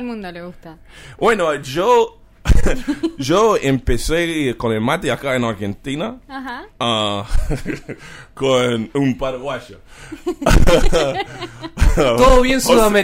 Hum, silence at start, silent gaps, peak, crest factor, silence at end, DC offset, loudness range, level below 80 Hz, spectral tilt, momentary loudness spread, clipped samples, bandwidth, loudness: none; 0 s; none; -2 dBFS; 14 dB; 0 s; under 0.1%; 5 LU; -22 dBFS; -5 dB/octave; 16 LU; under 0.1%; 16 kHz; -17 LUFS